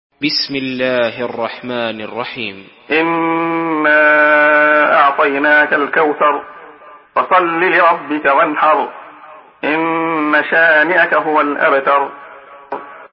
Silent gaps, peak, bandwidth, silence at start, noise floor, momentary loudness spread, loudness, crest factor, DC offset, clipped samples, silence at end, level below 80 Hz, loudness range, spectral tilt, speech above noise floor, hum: none; 0 dBFS; 5.8 kHz; 0.2 s; -39 dBFS; 13 LU; -13 LUFS; 14 dB; under 0.1%; under 0.1%; 0.05 s; -64 dBFS; 6 LU; -7.5 dB/octave; 26 dB; none